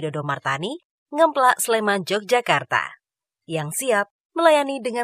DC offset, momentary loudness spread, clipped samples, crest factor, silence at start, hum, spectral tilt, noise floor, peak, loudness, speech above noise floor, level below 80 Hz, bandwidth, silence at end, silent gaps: under 0.1%; 13 LU; under 0.1%; 20 dB; 0 s; none; -3.5 dB/octave; -80 dBFS; -2 dBFS; -21 LUFS; 59 dB; -72 dBFS; 16 kHz; 0 s; 0.85-1.06 s, 4.11-4.30 s